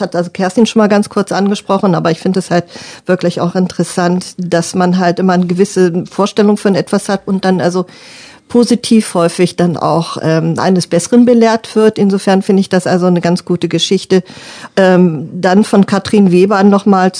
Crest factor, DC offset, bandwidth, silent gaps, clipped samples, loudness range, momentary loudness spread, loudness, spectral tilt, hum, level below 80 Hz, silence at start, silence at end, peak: 10 dB; under 0.1%; 10 kHz; none; 0.5%; 3 LU; 7 LU; -11 LUFS; -6 dB/octave; none; -56 dBFS; 0 s; 0 s; 0 dBFS